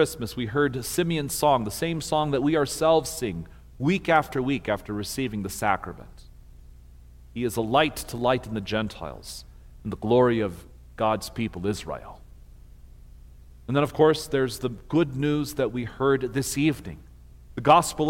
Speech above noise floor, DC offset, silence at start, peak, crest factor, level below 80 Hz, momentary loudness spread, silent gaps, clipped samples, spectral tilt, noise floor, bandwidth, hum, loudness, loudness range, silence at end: 23 dB; under 0.1%; 0 s; -6 dBFS; 20 dB; -48 dBFS; 17 LU; none; under 0.1%; -5 dB/octave; -48 dBFS; 17 kHz; 60 Hz at -50 dBFS; -25 LUFS; 5 LU; 0 s